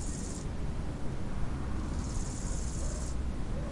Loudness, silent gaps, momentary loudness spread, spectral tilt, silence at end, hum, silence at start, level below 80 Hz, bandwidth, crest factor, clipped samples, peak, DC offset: -38 LUFS; none; 2 LU; -5.5 dB/octave; 0 s; none; 0 s; -36 dBFS; 11.5 kHz; 14 dB; under 0.1%; -18 dBFS; under 0.1%